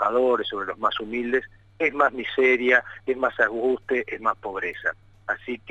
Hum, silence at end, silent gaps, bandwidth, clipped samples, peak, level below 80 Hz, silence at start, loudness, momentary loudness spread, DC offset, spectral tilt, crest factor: none; 0 s; none; 7.2 kHz; under 0.1%; -6 dBFS; -58 dBFS; 0 s; -24 LUFS; 10 LU; under 0.1%; -5 dB/octave; 18 dB